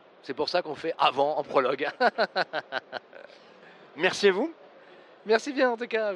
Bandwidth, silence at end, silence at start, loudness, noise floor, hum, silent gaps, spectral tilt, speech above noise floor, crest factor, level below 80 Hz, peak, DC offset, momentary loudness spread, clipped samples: 11.5 kHz; 0 s; 0.25 s; -27 LUFS; -52 dBFS; none; none; -3.5 dB/octave; 25 dB; 20 dB; -78 dBFS; -8 dBFS; under 0.1%; 13 LU; under 0.1%